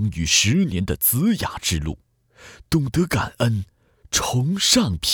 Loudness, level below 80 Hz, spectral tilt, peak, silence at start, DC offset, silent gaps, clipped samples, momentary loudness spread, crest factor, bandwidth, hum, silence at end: -20 LUFS; -38 dBFS; -3.5 dB/octave; -4 dBFS; 0 s; under 0.1%; none; under 0.1%; 10 LU; 18 dB; over 20 kHz; none; 0 s